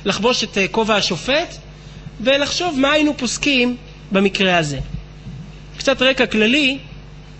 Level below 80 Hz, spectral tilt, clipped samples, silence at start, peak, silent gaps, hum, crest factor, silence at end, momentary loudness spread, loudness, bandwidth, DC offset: -40 dBFS; -3.5 dB/octave; under 0.1%; 0 s; -2 dBFS; none; none; 18 dB; 0 s; 20 LU; -17 LUFS; 8.4 kHz; under 0.1%